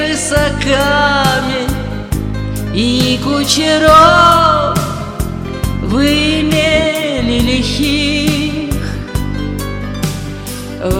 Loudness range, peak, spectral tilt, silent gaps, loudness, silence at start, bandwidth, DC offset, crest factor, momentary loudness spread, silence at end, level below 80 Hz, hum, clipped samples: 5 LU; 0 dBFS; -4.5 dB/octave; none; -13 LUFS; 0 s; 18.5 kHz; under 0.1%; 12 dB; 13 LU; 0 s; -26 dBFS; none; 0.4%